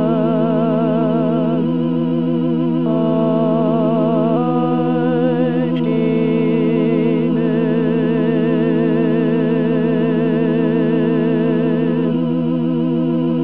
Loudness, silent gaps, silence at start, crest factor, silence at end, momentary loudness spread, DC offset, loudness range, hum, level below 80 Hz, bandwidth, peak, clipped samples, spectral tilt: -16 LUFS; none; 0 s; 12 dB; 0 s; 2 LU; 1%; 1 LU; none; -74 dBFS; 4.1 kHz; -4 dBFS; under 0.1%; -11.5 dB/octave